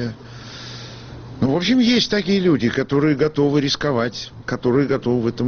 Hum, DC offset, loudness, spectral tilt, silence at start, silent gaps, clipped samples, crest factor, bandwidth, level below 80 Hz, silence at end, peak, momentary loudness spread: none; under 0.1%; -19 LUFS; -5 dB/octave; 0 s; none; under 0.1%; 14 dB; 6.8 kHz; -48 dBFS; 0 s; -6 dBFS; 18 LU